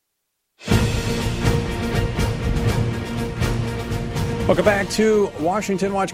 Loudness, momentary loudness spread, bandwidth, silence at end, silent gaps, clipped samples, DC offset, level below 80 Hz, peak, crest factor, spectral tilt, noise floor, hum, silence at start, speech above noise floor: -21 LUFS; 7 LU; 16 kHz; 0 s; none; under 0.1%; under 0.1%; -30 dBFS; -4 dBFS; 18 dB; -6 dB/octave; -75 dBFS; none; 0.6 s; 57 dB